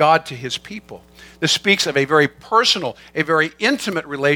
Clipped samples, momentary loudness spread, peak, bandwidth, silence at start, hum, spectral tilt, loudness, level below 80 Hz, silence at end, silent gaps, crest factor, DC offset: under 0.1%; 11 LU; 0 dBFS; 18.5 kHz; 0 s; none; -3.5 dB/octave; -18 LUFS; -56 dBFS; 0 s; none; 18 dB; under 0.1%